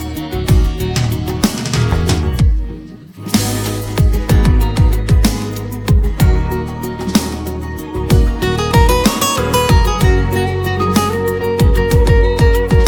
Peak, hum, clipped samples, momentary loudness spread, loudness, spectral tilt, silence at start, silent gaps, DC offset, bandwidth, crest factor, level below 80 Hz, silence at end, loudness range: 0 dBFS; none; under 0.1%; 10 LU; -15 LUFS; -5.5 dB/octave; 0 s; none; under 0.1%; 19 kHz; 12 dB; -16 dBFS; 0 s; 3 LU